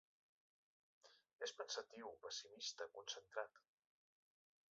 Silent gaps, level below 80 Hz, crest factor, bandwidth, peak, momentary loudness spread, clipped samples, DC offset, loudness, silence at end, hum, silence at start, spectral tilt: 1.33-1.39 s; under -90 dBFS; 26 dB; 7.6 kHz; -30 dBFS; 6 LU; under 0.1%; under 0.1%; -51 LUFS; 1.1 s; none; 1.05 s; 2 dB/octave